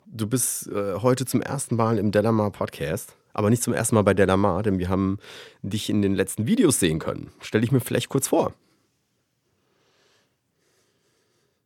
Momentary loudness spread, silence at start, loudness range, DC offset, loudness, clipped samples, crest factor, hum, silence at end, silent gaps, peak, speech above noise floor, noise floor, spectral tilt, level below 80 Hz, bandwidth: 10 LU; 0.05 s; 5 LU; under 0.1%; -23 LUFS; under 0.1%; 22 dB; none; 3.15 s; none; -2 dBFS; 49 dB; -72 dBFS; -5.5 dB/octave; -54 dBFS; 17.5 kHz